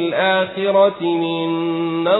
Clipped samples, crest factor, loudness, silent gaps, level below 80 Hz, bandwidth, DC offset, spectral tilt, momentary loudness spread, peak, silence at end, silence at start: under 0.1%; 14 dB; -18 LUFS; none; -64 dBFS; 4.1 kHz; under 0.1%; -11 dB/octave; 5 LU; -4 dBFS; 0 s; 0 s